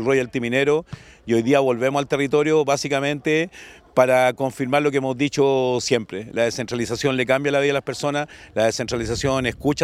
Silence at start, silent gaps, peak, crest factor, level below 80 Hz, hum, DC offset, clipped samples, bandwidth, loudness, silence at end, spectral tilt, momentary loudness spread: 0 s; none; -2 dBFS; 20 dB; -50 dBFS; none; under 0.1%; under 0.1%; 15 kHz; -21 LUFS; 0 s; -5 dB/octave; 7 LU